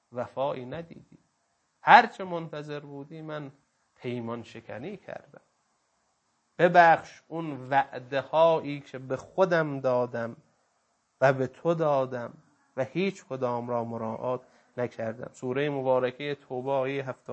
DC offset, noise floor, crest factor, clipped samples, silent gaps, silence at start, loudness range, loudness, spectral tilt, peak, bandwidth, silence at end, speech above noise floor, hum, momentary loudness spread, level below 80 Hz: under 0.1%; -74 dBFS; 28 dB; under 0.1%; none; 0.15 s; 13 LU; -27 LUFS; -6.5 dB/octave; 0 dBFS; 8.4 kHz; 0 s; 46 dB; none; 19 LU; -74 dBFS